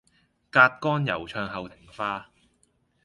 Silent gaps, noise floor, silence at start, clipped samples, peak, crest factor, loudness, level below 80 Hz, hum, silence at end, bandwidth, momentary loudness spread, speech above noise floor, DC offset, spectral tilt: none; -68 dBFS; 0.55 s; under 0.1%; -2 dBFS; 26 dB; -24 LUFS; -60 dBFS; none; 0.85 s; 11.5 kHz; 17 LU; 43 dB; under 0.1%; -6.5 dB/octave